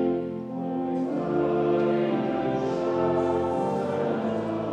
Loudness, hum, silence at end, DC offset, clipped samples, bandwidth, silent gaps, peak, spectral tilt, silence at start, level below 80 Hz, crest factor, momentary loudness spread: -26 LUFS; none; 0 s; under 0.1%; under 0.1%; 8.6 kHz; none; -14 dBFS; -8 dB/octave; 0 s; -58 dBFS; 12 dB; 6 LU